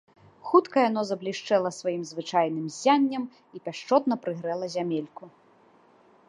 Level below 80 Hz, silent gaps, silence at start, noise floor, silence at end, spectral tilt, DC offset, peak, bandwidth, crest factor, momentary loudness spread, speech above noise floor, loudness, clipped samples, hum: -80 dBFS; none; 0.45 s; -59 dBFS; 1 s; -5 dB/octave; under 0.1%; -6 dBFS; 11 kHz; 20 dB; 15 LU; 33 dB; -26 LUFS; under 0.1%; none